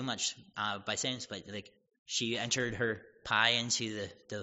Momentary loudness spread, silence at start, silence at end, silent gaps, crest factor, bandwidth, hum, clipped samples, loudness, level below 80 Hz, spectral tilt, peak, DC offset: 14 LU; 0 s; 0 s; 1.99-2.06 s; 24 dB; 8 kHz; none; under 0.1%; -33 LUFS; -66 dBFS; -1.5 dB/octave; -10 dBFS; under 0.1%